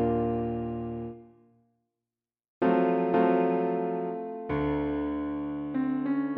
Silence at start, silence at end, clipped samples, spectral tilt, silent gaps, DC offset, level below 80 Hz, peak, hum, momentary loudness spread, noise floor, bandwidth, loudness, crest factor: 0 s; 0 s; under 0.1%; -7.5 dB/octave; 2.48-2.61 s; under 0.1%; -52 dBFS; -12 dBFS; none; 10 LU; under -90 dBFS; 4.9 kHz; -29 LUFS; 16 dB